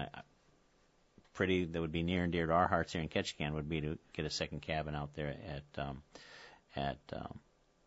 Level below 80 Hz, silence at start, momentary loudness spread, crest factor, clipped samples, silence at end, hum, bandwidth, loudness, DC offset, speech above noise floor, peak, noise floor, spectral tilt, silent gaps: -56 dBFS; 0 s; 19 LU; 24 dB; under 0.1%; 0.5 s; none; 7.6 kHz; -38 LUFS; under 0.1%; 33 dB; -16 dBFS; -71 dBFS; -4.5 dB/octave; none